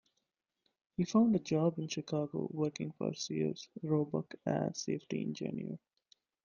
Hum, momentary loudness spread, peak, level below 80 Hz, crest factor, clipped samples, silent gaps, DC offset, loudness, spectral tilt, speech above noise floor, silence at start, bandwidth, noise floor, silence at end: none; 10 LU; -18 dBFS; -74 dBFS; 18 dB; under 0.1%; none; under 0.1%; -36 LUFS; -6.5 dB/octave; 50 dB; 1 s; 7.2 kHz; -85 dBFS; 0.7 s